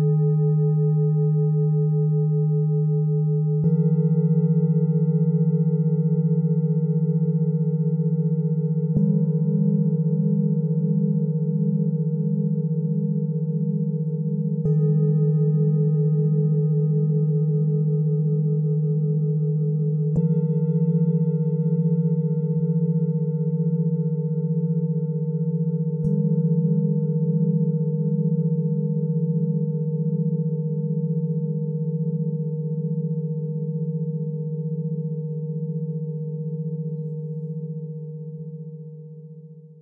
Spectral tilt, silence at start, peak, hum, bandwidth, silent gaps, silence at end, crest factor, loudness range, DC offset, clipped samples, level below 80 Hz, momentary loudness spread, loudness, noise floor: -16 dB/octave; 0 s; -10 dBFS; none; 1.3 kHz; none; 0.1 s; 12 dB; 7 LU; under 0.1%; under 0.1%; -62 dBFS; 8 LU; -23 LUFS; -43 dBFS